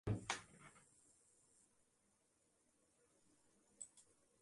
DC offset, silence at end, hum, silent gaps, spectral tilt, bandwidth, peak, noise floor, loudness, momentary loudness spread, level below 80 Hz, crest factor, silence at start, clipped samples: under 0.1%; 0.4 s; none; none; -4 dB/octave; 11.5 kHz; -24 dBFS; -81 dBFS; -49 LUFS; 23 LU; -70 dBFS; 30 dB; 0.05 s; under 0.1%